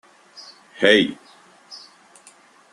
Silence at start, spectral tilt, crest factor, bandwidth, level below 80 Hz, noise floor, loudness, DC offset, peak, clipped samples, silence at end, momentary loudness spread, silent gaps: 0.8 s; -4 dB/octave; 22 dB; 11.5 kHz; -62 dBFS; -51 dBFS; -17 LUFS; under 0.1%; -2 dBFS; under 0.1%; 0.95 s; 27 LU; none